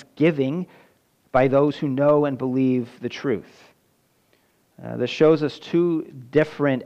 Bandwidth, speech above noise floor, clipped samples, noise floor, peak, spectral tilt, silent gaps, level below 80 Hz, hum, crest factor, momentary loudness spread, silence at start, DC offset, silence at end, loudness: 8.2 kHz; 43 dB; under 0.1%; -64 dBFS; -6 dBFS; -8 dB/octave; none; -60 dBFS; none; 16 dB; 11 LU; 0.15 s; under 0.1%; 0 s; -22 LUFS